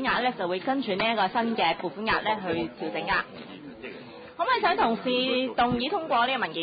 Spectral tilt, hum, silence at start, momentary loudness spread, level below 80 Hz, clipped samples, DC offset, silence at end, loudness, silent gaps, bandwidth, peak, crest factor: -9 dB/octave; none; 0 s; 16 LU; -58 dBFS; under 0.1%; under 0.1%; 0 s; -26 LUFS; none; 5 kHz; -12 dBFS; 16 dB